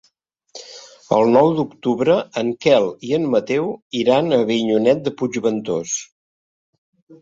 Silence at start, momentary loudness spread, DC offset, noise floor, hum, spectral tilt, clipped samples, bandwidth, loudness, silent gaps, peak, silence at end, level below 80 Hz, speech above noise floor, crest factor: 0.55 s; 11 LU; under 0.1%; -65 dBFS; none; -5 dB/octave; under 0.1%; 7.8 kHz; -18 LUFS; 3.82-3.91 s, 6.12-6.93 s, 7.02-7.07 s; -2 dBFS; 0.05 s; -62 dBFS; 47 dB; 18 dB